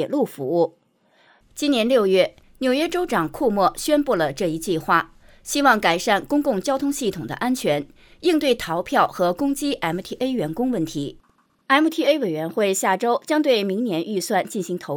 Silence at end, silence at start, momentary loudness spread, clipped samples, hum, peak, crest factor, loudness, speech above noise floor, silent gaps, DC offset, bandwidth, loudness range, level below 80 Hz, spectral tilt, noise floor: 0 s; 0 s; 8 LU; under 0.1%; none; -4 dBFS; 18 dB; -21 LUFS; 38 dB; none; under 0.1%; over 20 kHz; 2 LU; -52 dBFS; -4.5 dB/octave; -59 dBFS